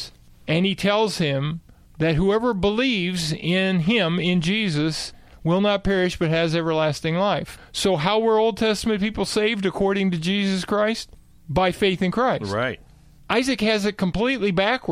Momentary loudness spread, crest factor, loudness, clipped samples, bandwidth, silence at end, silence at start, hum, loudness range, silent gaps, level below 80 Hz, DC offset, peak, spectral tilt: 6 LU; 18 dB; -22 LUFS; under 0.1%; 14.5 kHz; 0 s; 0 s; none; 2 LU; none; -44 dBFS; under 0.1%; -4 dBFS; -5.5 dB/octave